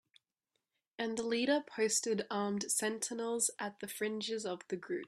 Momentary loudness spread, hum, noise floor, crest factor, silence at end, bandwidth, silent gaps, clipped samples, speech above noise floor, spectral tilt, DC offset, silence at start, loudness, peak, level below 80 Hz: 8 LU; none; -87 dBFS; 18 dB; 0 s; 15.5 kHz; none; under 0.1%; 51 dB; -2.5 dB/octave; under 0.1%; 1 s; -36 LUFS; -18 dBFS; -82 dBFS